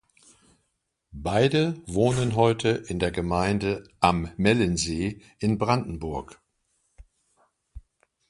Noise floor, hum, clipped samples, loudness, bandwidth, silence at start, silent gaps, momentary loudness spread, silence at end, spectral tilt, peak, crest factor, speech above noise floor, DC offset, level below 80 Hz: -77 dBFS; none; under 0.1%; -25 LUFS; 11.5 kHz; 1.15 s; none; 10 LU; 0.5 s; -5.5 dB/octave; -4 dBFS; 22 dB; 53 dB; under 0.1%; -46 dBFS